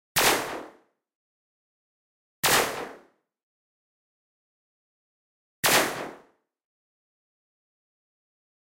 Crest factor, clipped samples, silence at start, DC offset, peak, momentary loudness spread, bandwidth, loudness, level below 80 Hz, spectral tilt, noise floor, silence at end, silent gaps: 24 dB; under 0.1%; 0.15 s; under 0.1%; -8 dBFS; 18 LU; 16 kHz; -23 LUFS; -62 dBFS; -1 dB/octave; -59 dBFS; 2.5 s; 1.15-2.43 s, 3.43-5.63 s